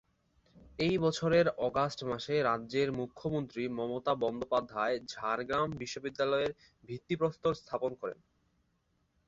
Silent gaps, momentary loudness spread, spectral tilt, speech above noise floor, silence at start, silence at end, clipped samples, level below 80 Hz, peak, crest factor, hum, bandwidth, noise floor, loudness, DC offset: none; 9 LU; -6 dB/octave; 43 dB; 0.55 s; 1.15 s; under 0.1%; -64 dBFS; -16 dBFS; 18 dB; none; 8 kHz; -76 dBFS; -33 LUFS; under 0.1%